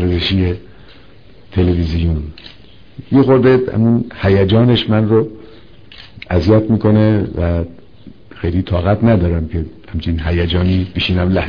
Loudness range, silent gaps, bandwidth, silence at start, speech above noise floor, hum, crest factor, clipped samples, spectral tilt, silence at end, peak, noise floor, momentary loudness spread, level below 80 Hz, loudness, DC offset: 4 LU; none; 5.4 kHz; 0 s; 30 dB; none; 14 dB; under 0.1%; -9 dB/octave; 0 s; 0 dBFS; -43 dBFS; 12 LU; -30 dBFS; -15 LUFS; 0.9%